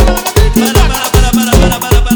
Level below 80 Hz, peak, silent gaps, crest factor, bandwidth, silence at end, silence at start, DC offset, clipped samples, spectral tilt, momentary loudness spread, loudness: -12 dBFS; 0 dBFS; none; 8 dB; over 20 kHz; 0 s; 0 s; under 0.1%; 1%; -4.5 dB/octave; 2 LU; -10 LUFS